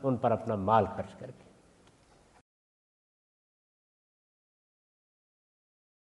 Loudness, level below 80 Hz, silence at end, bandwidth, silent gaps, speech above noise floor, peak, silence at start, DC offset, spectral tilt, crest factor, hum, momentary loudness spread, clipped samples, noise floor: -29 LUFS; -72 dBFS; 4.85 s; 11.5 kHz; none; 32 dB; -10 dBFS; 0 s; under 0.1%; -8.5 dB/octave; 26 dB; none; 20 LU; under 0.1%; -62 dBFS